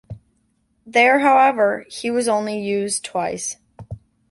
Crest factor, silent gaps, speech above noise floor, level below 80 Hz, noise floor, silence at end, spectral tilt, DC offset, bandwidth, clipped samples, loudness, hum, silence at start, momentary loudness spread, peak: 18 dB; none; 47 dB; -54 dBFS; -65 dBFS; 0.35 s; -3.5 dB/octave; under 0.1%; 11.5 kHz; under 0.1%; -18 LUFS; none; 0.1 s; 24 LU; -2 dBFS